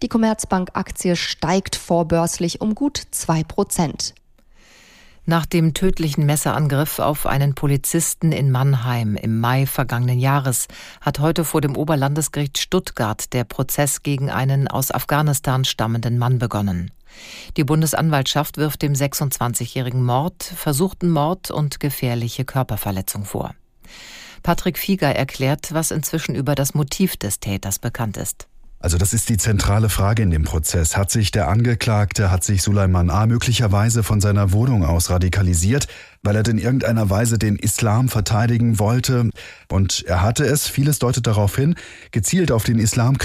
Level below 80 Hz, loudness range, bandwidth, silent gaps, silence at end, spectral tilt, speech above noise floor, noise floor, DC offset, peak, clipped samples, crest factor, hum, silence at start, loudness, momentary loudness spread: -36 dBFS; 4 LU; 16 kHz; none; 0 s; -5 dB/octave; 31 dB; -50 dBFS; under 0.1%; -4 dBFS; under 0.1%; 14 dB; none; 0 s; -19 LUFS; 6 LU